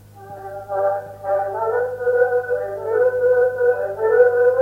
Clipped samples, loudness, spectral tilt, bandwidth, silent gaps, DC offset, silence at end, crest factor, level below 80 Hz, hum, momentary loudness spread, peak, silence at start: under 0.1%; -19 LUFS; -6.5 dB/octave; 2.7 kHz; none; under 0.1%; 0 s; 16 dB; -58 dBFS; none; 12 LU; -2 dBFS; 0.15 s